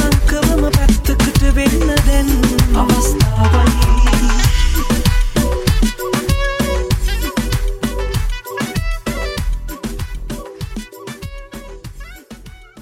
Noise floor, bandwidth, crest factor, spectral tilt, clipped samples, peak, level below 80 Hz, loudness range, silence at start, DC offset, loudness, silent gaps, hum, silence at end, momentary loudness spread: -36 dBFS; 16.5 kHz; 14 dB; -5 dB/octave; under 0.1%; 0 dBFS; -16 dBFS; 12 LU; 0 s; under 0.1%; -16 LUFS; none; none; 0 s; 17 LU